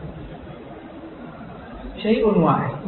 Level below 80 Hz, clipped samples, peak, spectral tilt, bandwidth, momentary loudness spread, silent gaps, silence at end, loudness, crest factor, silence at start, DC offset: -44 dBFS; under 0.1%; -6 dBFS; -12 dB/octave; 4.3 kHz; 21 LU; none; 0 s; -19 LUFS; 18 dB; 0 s; under 0.1%